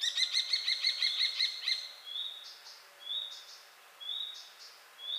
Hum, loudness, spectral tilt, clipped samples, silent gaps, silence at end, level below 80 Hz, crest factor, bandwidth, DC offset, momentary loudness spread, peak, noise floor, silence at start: none; -32 LUFS; 5.5 dB/octave; under 0.1%; none; 0 s; under -90 dBFS; 20 dB; 15.5 kHz; under 0.1%; 21 LU; -18 dBFS; -55 dBFS; 0 s